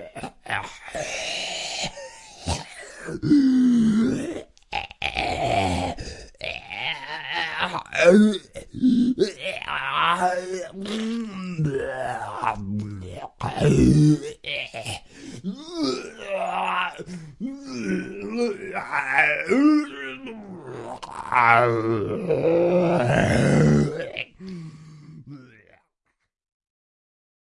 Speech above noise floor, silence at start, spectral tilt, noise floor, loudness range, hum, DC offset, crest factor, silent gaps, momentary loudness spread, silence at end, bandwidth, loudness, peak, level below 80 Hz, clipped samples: 56 dB; 0 s; -6 dB/octave; -75 dBFS; 8 LU; none; under 0.1%; 22 dB; none; 18 LU; 1.95 s; 11.5 kHz; -23 LUFS; 0 dBFS; -46 dBFS; under 0.1%